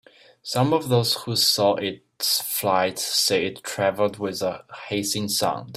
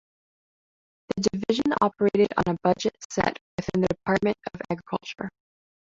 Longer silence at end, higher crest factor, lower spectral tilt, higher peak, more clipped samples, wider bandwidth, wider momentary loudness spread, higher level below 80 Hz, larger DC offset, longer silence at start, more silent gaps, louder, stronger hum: second, 0 s vs 0.65 s; about the same, 18 dB vs 20 dB; second, -3.5 dB/octave vs -5.5 dB/octave; about the same, -6 dBFS vs -6 dBFS; neither; first, 16 kHz vs 7.8 kHz; about the same, 9 LU vs 11 LU; second, -64 dBFS vs -54 dBFS; neither; second, 0.45 s vs 1.1 s; second, none vs 3.05-3.10 s, 3.41-3.58 s; first, -22 LUFS vs -26 LUFS; neither